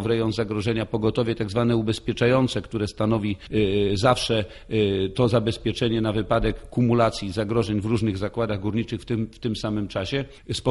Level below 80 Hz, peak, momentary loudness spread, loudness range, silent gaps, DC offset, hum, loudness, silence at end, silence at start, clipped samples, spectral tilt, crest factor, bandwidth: -42 dBFS; -6 dBFS; 7 LU; 2 LU; none; under 0.1%; none; -24 LUFS; 0 s; 0 s; under 0.1%; -6.5 dB/octave; 18 dB; 11.5 kHz